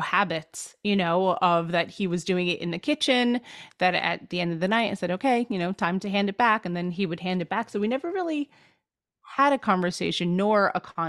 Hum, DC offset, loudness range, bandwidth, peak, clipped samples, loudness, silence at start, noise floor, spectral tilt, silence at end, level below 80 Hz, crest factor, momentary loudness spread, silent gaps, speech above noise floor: none; under 0.1%; 2 LU; 12.5 kHz; -8 dBFS; under 0.1%; -25 LUFS; 0 s; -78 dBFS; -5 dB/octave; 0 s; -66 dBFS; 18 dB; 7 LU; none; 53 dB